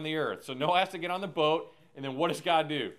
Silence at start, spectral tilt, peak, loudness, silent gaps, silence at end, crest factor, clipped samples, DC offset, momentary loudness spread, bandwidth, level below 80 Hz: 0 s; -5 dB/octave; -12 dBFS; -30 LUFS; none; 0.05 s; 20 dB; under 0.1%; under 0.1%; 9 LU; 15.5 kHz; -78 dBFS